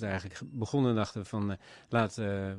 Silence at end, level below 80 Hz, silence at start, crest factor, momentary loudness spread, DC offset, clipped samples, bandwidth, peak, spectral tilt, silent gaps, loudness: 0 s; -64 dBFS; 0 s; 20 dB; 10 LU; under 0.1%; under 0.1%; 11 kHz; -12 dBFS; -6.5 dB/octave; none; -33 LUFS